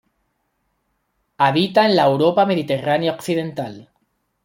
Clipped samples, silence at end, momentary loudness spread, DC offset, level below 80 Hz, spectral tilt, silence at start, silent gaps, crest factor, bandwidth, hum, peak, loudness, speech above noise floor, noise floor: under 0.1%; 0.65 s; 10 LU; under 0.1%; -64 dBFS; -6 dB/octave; 1.4 s; none; 18 dB; 16.5 kHz; none; -2 dBFS; -18 LUFS; 53 dB; -70 dBFS